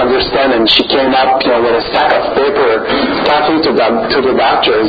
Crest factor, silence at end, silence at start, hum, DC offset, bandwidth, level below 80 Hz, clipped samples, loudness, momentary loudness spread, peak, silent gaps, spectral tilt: 10 dB; 0 s; 0 s; none; under 0.1%; 7.8 kHz; -38 dBFS; under 0.1%; -10 LUFS; 3 LU; 0 dBFS; none; -6 dB/octave